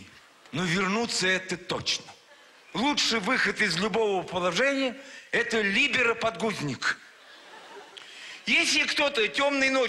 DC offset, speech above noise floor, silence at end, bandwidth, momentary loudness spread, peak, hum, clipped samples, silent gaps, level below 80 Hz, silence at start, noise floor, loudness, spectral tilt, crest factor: under 0.1%; 28 dB; 0 s; 13.5 kHz; 15 LU; -12 dBFS; none; under 0.1%; none; -64 dBFS; 0 s; -54 dBFS; -25 LUFS; -3 dB/octave; 14 dB